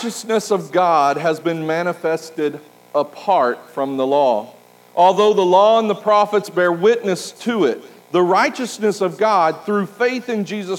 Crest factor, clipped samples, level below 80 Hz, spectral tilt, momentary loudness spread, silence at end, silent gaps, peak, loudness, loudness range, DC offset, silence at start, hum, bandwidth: 16 dB; under 0.1%; -82 dBFS; -5 dB/octave; 10 LU; 0 s; none; -2 dBFS; -17 LUFS; 4 LU; under 0.1%; 0 s; 60 Hz at -50 dBFS; 17 kHz